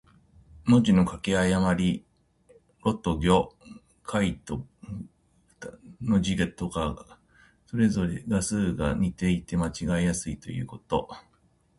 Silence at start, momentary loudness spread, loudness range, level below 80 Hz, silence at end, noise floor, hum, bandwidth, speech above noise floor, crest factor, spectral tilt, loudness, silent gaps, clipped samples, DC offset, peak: 0.55 s; 18 LU; 5 LU; -44 dBFS; 0.6 s; -65 dBFS; none; 11.5 kHz; 39 dB; 20 dB; -6 dB/octave; -27 LUFS; none; under 0.1%; under 0.1%; -8 dBFS